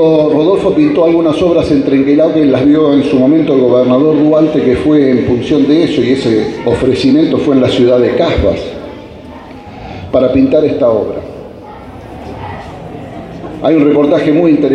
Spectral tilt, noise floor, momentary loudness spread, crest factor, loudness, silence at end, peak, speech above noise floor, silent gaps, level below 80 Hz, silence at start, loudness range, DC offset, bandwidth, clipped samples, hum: -7.5 dB/octave; -29 dBFS; 19 LU; 10 dB; -10 LUFS; 0 s; 0 dBFS; 21 dB; none; -34 dBFS; 0 s; 6 LU; under 0.1%; 9.6 kHz; under 0.1%; none